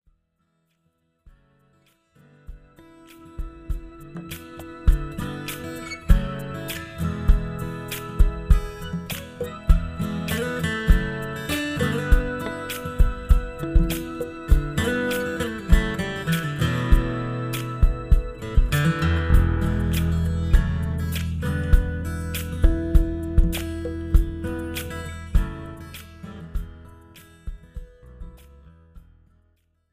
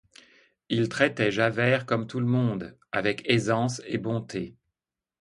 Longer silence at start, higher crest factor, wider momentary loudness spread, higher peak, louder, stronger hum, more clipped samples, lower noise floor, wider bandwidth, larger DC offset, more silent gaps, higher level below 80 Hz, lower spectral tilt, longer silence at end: first, 2.5 s vs 0.7 s; about the same, 22 dB vs 22 dB; first, 16 LU vs 9 LU; first, -2 dBFS vs -6 dBFS; about the same, -25 LUFS vs -26 LUFS; neither; neither; second, -71 dBFS vs -90 dBFS; first, 16 kHz vs 11 kHz; neither; neither; first, -24 dBFS vs -62 dBFS; about the same, -6 dB/octave vs -6 dB/octave; first, 0.95 s vs 0.7 s